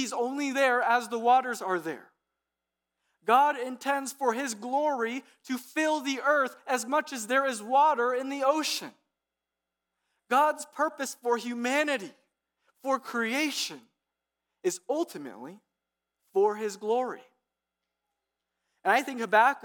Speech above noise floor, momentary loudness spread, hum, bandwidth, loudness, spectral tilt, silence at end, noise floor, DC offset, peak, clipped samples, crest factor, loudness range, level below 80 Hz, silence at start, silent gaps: 60 dB; 13 LU; none; 19 kHz; -28 LUFS; -2.5 dB/octave; 0.05 s; -88 dBFS; under 0.1%; -10 dBFS; under 0.1%; 20 dB; 6 LU; under -90 dBFS; 0 s; none